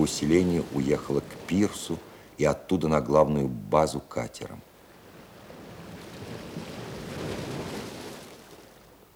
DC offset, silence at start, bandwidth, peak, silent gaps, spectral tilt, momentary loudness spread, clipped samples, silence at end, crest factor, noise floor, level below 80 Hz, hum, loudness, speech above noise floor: under 0.1%; 0 s; 19 kHz; -6 dBFS; none; -6 dB/octave; 23 LU; under 0.1%; 0.5 s; 24 dB; -53 dBFS; -52 dBFS; none; -28 LUFS; 27 dB